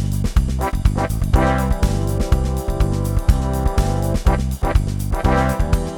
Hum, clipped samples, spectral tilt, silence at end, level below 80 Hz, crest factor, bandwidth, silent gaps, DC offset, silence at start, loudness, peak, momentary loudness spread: none; under 0.1%; -6.5 dB/octave; 0 s; -20 dBFS; 16 dB; 19 kHz; none; under 0.1%; 0 s; -20 LUFS; -2 dBFS; 3 LU